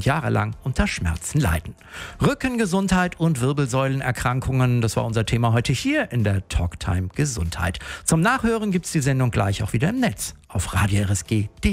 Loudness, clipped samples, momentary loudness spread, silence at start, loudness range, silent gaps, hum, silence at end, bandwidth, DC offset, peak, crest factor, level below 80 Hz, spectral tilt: -22 LUFS; under 0.1%; 6 LU; 0 s; 1 LU; none; none; 0 s; 16 kHz; under 0.1%; -6 dBFS; 16 dB; -36 dBFS; -5.5 dB/octave